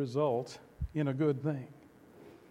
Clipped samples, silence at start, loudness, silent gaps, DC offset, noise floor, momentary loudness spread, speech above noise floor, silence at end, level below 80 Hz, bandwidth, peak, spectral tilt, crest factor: under 0.1%; 0 s; -34 LUFS; none; under 0.1%; -57 dBFS; 14 LU; 24 dB; 0.15 s; -50 dBFS; 11.5 kHz; -18 dBFS; -8 dB/octave; 16 dB